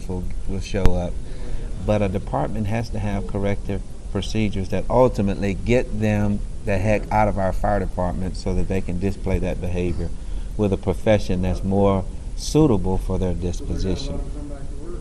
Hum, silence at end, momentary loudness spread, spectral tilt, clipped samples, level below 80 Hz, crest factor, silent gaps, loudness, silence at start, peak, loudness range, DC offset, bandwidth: none; 0 s; 12 LU; -7 dB/octave; under 0.1%; -28 dBFS; 20 dB; none; -23 LUFS; 0 s; 0 dBFS; 4 LU; under 0.1%; 12 kHz